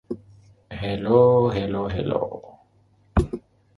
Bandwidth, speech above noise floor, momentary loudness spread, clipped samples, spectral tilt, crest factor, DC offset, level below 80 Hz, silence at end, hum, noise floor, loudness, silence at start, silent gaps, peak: 11 kHz; 39 dB; 20 LU; under 0.1%; -8.5 dB/octave; 20 dB; under 0.1%; -38 dBFS; 0.4 s; none; -60 dBFS; -22 LUFS; 0.1 s; none; -2 dBFS